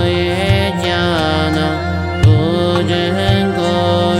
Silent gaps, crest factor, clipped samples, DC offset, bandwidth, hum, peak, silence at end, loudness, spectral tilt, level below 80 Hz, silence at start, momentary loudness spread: none; 14 dB; under 0.1%; under 0.1%; 13 kHz; none; 0 dBFS; 0 s; -14 LUFS; -6.5 dB/octave; -30 dBFS; 0 s; 4 LU